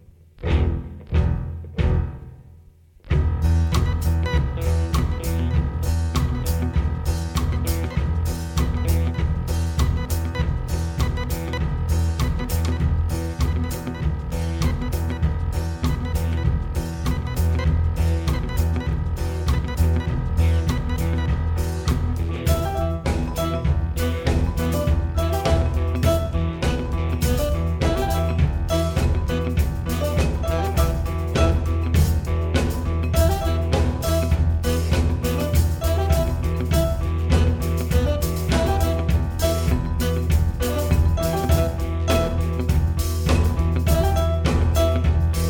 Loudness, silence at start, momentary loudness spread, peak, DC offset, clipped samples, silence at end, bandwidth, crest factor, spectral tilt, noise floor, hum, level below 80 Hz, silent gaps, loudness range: -23 LUFS; 0.4 s; 5 LU; -6 dBFS; under 0.1%; under 0.1%; 0 s; 18.5 kHz; 14 dB; -6.5 dB/octave; -49 dBFS; none; -24 dBFS; none; 3 LU